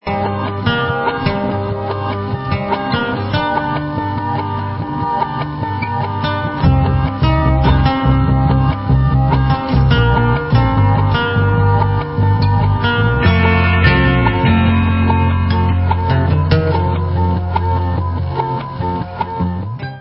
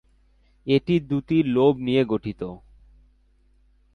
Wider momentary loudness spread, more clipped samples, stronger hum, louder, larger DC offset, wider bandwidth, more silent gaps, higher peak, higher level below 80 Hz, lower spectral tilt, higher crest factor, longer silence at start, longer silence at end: second, 8 LU vs 15 LU; neither; neither; first, -15 LUFS vs -22 LUFS; neither; second, 5.8 kHz vs 6.4 kHz; neither; first, 0 dBFS vs -6 dBFS; first, -22 dBFS vs -52 dBFS; first, -11 dB/octave vs -9 dB/octave; about the same, 14 dB vs 18 dB; second, 0.05 s vs 0.65 s; second, 0 s vs 1.4 s